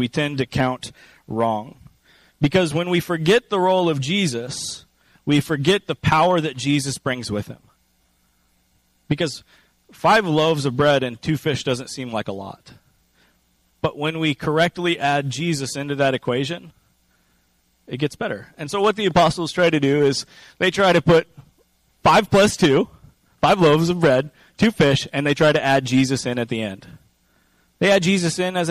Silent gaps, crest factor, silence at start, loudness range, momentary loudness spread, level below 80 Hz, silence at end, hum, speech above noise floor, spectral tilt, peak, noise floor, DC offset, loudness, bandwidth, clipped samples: none; 14 dB; 0 s; 7 LU; 12 LU; -50 dBFS; 0 s; none; 44 dB; -5 dB/octave; -6 dBFS; -63 dBFS; under 0.1%; -20 LUFS; 15.5 kHz; under 0.1%